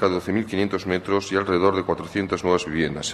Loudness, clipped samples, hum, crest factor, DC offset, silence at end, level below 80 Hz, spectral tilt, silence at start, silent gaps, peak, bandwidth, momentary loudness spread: -23 LUFS; under 0.1%; none; 18 dB; under 0.1%; 0 s; -50 dBFS; -5 dB/octave; 0 s; none; -6 dBFS; 13 kHz; 5 LU